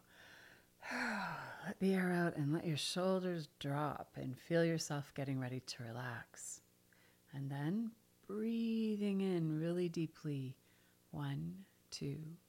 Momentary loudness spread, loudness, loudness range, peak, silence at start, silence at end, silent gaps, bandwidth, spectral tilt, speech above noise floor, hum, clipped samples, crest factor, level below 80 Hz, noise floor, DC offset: 14 LU; -41 LUFS; 6 LU; -24 dBFS; 0.15 s; 0.15 s; none; 16.5 kHz; -5.5 dB/octave; 31 dB; 60 Hz at -70 dBFS; under 0.1%; 16 dB; -76 dBFS; -70 dBFS; under 0.1%